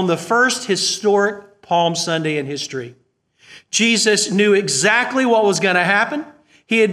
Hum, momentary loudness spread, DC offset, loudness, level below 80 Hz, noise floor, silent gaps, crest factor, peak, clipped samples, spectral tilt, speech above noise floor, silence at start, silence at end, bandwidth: none; 10 LU; under 0.1%; -16 LUFS; -68 dBFS; -56 dBFS; none; 18 dB; 0 dBFS; under 0.1%; -3 dB/octave; 39 dB; 0 s; 0 s; 15 kHz